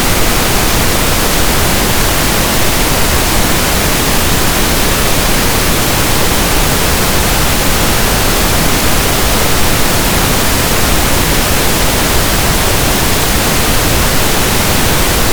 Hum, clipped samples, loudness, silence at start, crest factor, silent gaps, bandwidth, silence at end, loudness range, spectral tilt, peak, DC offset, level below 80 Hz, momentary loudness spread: none; under 0.1%; -10 LUFS; 0 s; 10 dB; none; over 20 kHz; 0 s; 0 LU; -3 dB/octave; 0 dBFS; under 0.1%; -18 dBFS; 0 LU